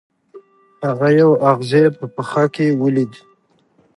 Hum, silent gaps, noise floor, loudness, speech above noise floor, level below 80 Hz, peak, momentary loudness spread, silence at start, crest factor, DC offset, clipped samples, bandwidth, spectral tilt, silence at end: none; none; -58 dBFS; -16 LUFS; 43 dB; -66 dBFS; 0 dBFS; 12 LU; 0.35 s; 16 dB; under 0.1%; under 0.1%; 11.5 kHz; -8 dB/octave; 0.9 s